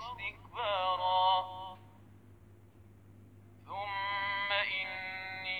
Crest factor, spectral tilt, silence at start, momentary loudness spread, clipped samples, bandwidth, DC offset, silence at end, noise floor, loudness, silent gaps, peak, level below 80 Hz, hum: 20 dB; -4 dB/octave; 0 s; 15 LU; under 0.1%; 19.5 kHz; under 0.1%; 0 s; -58 dBFS; -34 LUFS; none; -16 dBFS; -68 dBFS; none